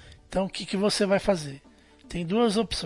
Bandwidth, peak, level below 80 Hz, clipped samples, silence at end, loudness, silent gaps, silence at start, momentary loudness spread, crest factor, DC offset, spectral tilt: 11.5 kHz; -10 dBFS; -48 dBFS; under 0.1%; 0 s; -26 LUFS; none; 0.05 s; 13 LU; 18 dB; under 0.1%; -5 dB/octave